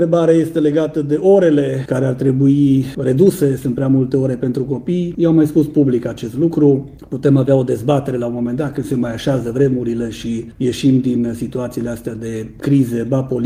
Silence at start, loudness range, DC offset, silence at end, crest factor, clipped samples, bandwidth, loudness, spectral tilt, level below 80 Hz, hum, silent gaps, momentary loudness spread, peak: 0 s; 4 LU; under 0.1%; 0 s; 16 dB; under 0.1%; 16 kHz; -16 LUFS; -8 dB/octave; -46 dBFS; none; none; 10 LU; 0 dBFS